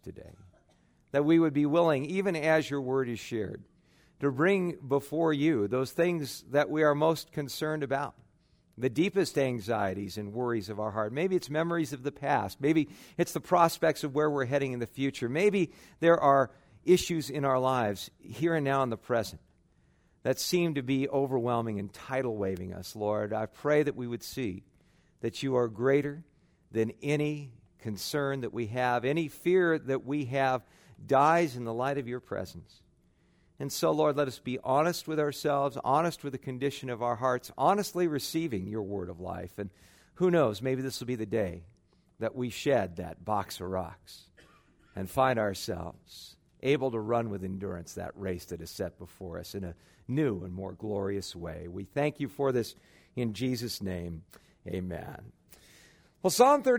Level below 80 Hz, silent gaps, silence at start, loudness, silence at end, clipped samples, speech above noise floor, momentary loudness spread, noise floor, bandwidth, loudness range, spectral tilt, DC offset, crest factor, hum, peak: -62 dBFS; none; 0.05 s; -30 LUFS; 0 s; under 0.1%; 37 dB; 14 LU; -66 dBFS; 16.5 kHz; 6 LU; -5.5 dB/octave; under 0.1%; 22 dB; none; -8 dBFS